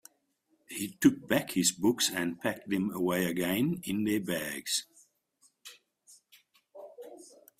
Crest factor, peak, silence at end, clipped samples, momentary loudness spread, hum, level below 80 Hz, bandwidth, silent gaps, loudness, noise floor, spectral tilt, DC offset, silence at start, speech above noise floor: 22 dB; -10 dBFS; 0.35 s; under 0.1%; 23 LU; none; -68 dBFS; 16 kHz; none; -30 LUFS; -74 dBFS; -3.5 dB/octave; under 0.1%; 0.7 s; 44 dB